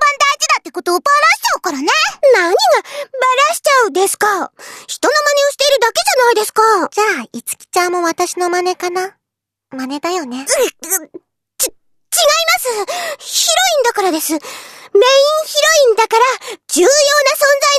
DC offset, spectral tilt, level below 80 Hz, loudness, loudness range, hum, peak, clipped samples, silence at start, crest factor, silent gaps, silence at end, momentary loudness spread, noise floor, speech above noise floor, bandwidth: under 0.1%; 0.5 dB/octave; -62 dBFS; -13 LUFS; 6 LU; none; 0 dBFS; under 0.1%; 0 s; 14 dB; none; 0 s; 11 LU; -80 dBFS; 67 dB; 14 kHz